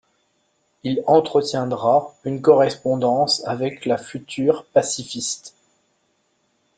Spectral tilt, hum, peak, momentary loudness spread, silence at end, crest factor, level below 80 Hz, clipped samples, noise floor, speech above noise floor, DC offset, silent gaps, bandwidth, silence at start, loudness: -4.5 dB/octave; none; -2 dBFS; 10 LU; 1.3 s; 20 dB; -64 dBFS; under 0.1%; -67 dBFS; 47 dB; under 0.1%; none; 9.4 kHz; 0.85 s; -20 LUFS